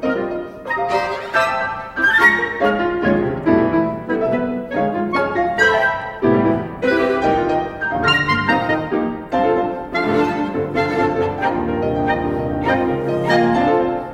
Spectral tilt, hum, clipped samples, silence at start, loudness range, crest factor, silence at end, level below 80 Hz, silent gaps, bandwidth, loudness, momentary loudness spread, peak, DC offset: -6.5 dB/octave; none; under 0.1%; 0 s; 3 LU; 16 dB; 0 s; -42 dBFS; none; 15.5 kHz; -18 LUFS; 7 LU; -2 dBFS; under 0.1%